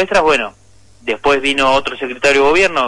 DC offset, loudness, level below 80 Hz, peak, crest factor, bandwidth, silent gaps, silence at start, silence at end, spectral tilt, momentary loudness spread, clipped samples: under 0.1%; -13 LUFS; -40 dBFS; -2 dBFS; 12 dB; 11.5 kHz; none; 0 s; 0 s; -3 dB/octave; 12 LU; under 0.1%